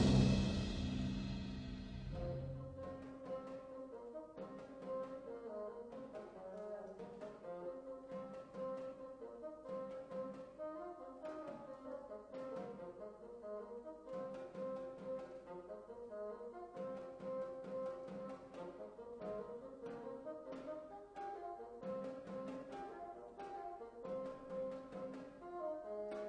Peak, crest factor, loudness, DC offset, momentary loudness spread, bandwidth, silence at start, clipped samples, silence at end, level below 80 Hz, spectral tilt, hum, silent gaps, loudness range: -20 dBFS; 26 dB; -47 LUFS; under 0.1%; 7 LU; 9.6 kHz; 0 s; under 0.1%; 0 s; -58 dBFS; -7 dB/octave; none; none; 2 LU